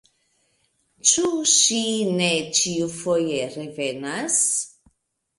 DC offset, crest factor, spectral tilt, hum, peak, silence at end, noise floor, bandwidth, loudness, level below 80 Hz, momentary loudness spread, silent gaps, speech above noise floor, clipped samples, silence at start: under 0.1%; 22 dB; -2 dB/octave; none; -2 dBFS; 0.7 s; -70 dBFS; 11.5 kHz; -20 LUFS; -66 dBFS; 12 LU; none; 48 dB; under 0.1%; 1.05 s